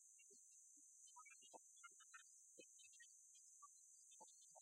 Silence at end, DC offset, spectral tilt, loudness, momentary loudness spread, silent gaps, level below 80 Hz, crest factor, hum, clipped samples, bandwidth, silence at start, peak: 0 s; under 0.1%; 1.5 dB/octave; -65 LUFS; 2 LU; none; under -90 dBFS; 20 dB; none; under 0.1%; 13.5 kHz; 0 s; -48 dBFS